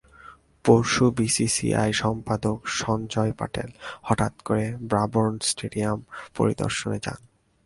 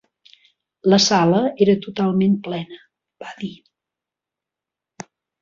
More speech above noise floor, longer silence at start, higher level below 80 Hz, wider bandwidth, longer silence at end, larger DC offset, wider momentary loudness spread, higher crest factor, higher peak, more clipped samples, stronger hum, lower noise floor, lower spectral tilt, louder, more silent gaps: second, 25 dB vs 69 dB; second, 0.25 s vs 0.85 s; first, -50 dBFS vs -62 dBFS; first, 11.5 kHz vs 7.6 kHz; second, 0.5 s vs 1.9 s; neither; second, 11 LU vs 25 LU; about the same, 22 dB vs 18 dB; about the same, -2 dBFS vs -4 dBFS; neither; neither; second, -49 dBFS vs -87 dBFS; about the same, -4.5 dB/octave vs -5 dB/octave; second, -24 LUFS vs -18 LUFS; neither